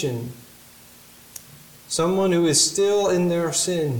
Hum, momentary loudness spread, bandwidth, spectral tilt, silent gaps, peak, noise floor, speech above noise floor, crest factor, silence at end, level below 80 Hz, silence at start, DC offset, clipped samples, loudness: none; 23 LU; 19 kHz; -4 dB/octave; none; -6 dBFS; -48 dBFS; 27 dB; 16 dB; 0 s; -58 dBFS; 0 s; under 0.1%; under 0.1%; -20 LUFS